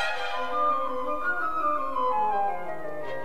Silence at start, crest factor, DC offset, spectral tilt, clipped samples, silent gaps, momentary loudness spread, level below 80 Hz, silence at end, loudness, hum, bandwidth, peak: 0 s; 12 dB; 2%; -4 dB/octave; under 0.1%; none; 9 LU; -56 dBFS; 0 s; -28 LUFS; none; 14.5 kHz; -14 dBFS